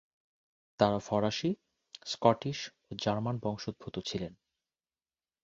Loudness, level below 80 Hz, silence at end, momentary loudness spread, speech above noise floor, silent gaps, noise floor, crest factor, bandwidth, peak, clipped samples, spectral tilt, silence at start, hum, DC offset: -33 LUFS; -64 dBFS; 1.1 s; 14 LU; over 58 dB; none; under -90 dBFS; 26 dB; 7.8 kHz; -8 dBFS; under 0.1%; -5.5 dB/octave; 0.8 s; none; under 0.1%